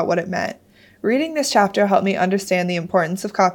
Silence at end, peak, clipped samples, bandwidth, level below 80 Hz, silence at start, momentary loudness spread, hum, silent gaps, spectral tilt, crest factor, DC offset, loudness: 0 s; -2 dBFS; under 0.1%; 18 kHz; -64 dBFS; 0 s; 8 LU; none; none; -5 dB/octave; 16 dB; under 0.1%; -19 LUFS